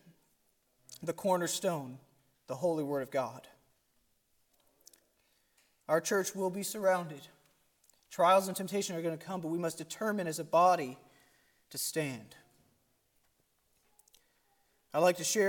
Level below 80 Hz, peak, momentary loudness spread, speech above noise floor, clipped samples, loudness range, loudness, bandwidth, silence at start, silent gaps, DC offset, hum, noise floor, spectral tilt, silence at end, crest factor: -82 dBFS; -14 dBFS; 18 LU; 42 dB; under 0.1%; 11 LU; -33 LUFS; 17.5 kHz; 0.9 s; none; under 0.1%; none; -75 dBFS; -4 dB/octave; 0 s; 22 dB